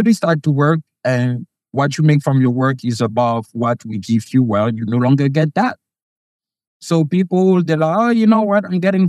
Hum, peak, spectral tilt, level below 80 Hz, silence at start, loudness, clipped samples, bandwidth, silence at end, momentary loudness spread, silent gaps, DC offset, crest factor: none; -2 dBFS; -7.5 dB/octave; -66 dBFS; 0 s; -16 LUFS; under 0.1%; 12.5 kHz; 0 s; 6 LU; 6.02-6.40 s, 6.67-6.80 s; under 0.1%; 14 dB